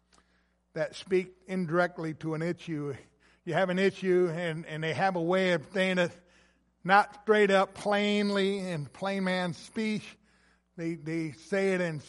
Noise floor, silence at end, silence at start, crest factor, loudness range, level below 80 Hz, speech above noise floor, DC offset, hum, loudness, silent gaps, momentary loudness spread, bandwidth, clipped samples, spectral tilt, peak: -70 dBFS; 0.05 s; 0.75 s; 22 dB; 6 LU; -70 dBFS; 41 dB; under 0.1%; none; -29 LUFS; none; 12 LU; 11.5 kHz; under 0.1%; -6 dB/octave; -8 dBFS